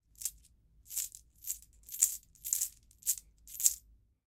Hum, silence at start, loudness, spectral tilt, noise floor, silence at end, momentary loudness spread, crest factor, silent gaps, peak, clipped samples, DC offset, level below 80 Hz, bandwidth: none; 0.2 s; -34 LUFS; 3 dB/octave; -64 dBFS; 0.45 s; 14 LU; 32 dB; none; -6 dBFS; under 0.1%; under 0.1%; -66 dBFS; 18 kHz